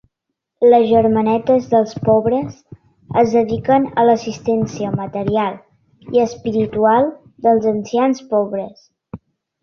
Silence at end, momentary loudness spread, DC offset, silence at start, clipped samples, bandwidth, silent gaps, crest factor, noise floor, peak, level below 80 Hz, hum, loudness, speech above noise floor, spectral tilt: 0.45 s; 8 LU; under 0.1%; 0.6 s; under 0.1%; 6.8 kHz; none; 14 dB; -77 dBFS; -2 dBFS; -50 dBFS; none; -16 LUFS; 62 dB; -7 dB/octave